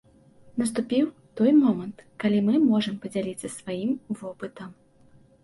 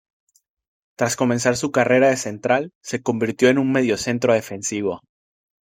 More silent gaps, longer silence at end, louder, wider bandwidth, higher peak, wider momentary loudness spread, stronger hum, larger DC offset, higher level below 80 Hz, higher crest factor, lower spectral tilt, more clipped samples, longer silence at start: second, none vs 2.75-2.81 s; about the same, 0.7 s vs 0.75 s; second, -25 LUFS vs -20 LUFS; second, 11.5 kHz vs 16.5 kHz; second, -10 dBFS vs -2 dBFS; first, 17 LU vs 10 LU; neither; neither; second, -66 dBFS vs -60 dBFS; about the same, 16 dB vs 18 dB; first, -6 dB/octave vs -4.5 dB/octave; neither; second, 0.55 s vs 1 s